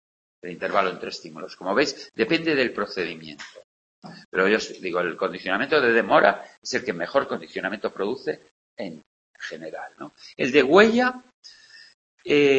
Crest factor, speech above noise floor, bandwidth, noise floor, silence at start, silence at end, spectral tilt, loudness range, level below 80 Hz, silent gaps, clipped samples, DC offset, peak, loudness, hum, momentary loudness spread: 22 dB; 25 dB; 8.4 kHz; -48 dBFS; 0.45 s; 0 s; -4.5 dB/octave; 7 LU; -64 dBFS; 3.64-4.02 s, 4.25-4.32 s, 6.58-6.62 s, 8.51-8.77 s, 9.06-9.34 s, 11.34-11.43 s, 11.94-12.18 s; under 0.1%; under 0.1%; -2 dBFS; -23 LUFS; none; 20 LU